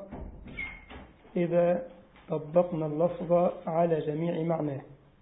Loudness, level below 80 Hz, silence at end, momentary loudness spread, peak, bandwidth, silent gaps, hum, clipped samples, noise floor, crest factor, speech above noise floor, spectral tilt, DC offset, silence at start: -29 LUFS; -54 dBFS; 0.25 s; 18 LU; -10 dBFS; 3.9 kHz; none; none; under 0.1%; -49 dBFS; 20 dB; 21 dB; -11.5 dB/octave; under 0.1%; 0 s